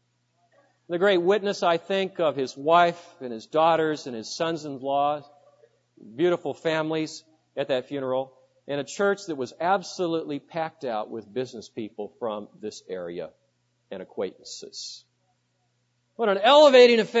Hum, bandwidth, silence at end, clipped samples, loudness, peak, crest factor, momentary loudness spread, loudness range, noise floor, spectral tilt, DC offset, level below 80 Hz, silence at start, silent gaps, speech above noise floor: none; 8 kHz; 0 s; under 0.1%; -24 LUFS; -4 dBFS; 22 dB; 18 LU; 12 LU; -72 dBFS; -4.5 dB/octave; under 0.1%; -78 dBFS; 0.9 s; none; 47 dB